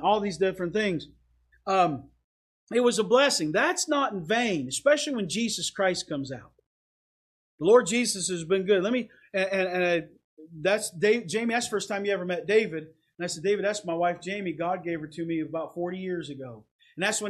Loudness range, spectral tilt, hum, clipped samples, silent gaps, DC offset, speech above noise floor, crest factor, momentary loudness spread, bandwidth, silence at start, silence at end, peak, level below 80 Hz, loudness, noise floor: 5 LU; -3.5 dB/octave; none; under 0.1%; 2.24-2.67 s, 6.66-7.58 s, 10.24-10.37 s, 16.71-16.79 s; under 0.1%; over 64 dB; 20 dB; 11 LU; 14 kHz; 0 s; 0 s; -8 dBFS; -66 dBFS; -27 LUFS; under -90 dBFS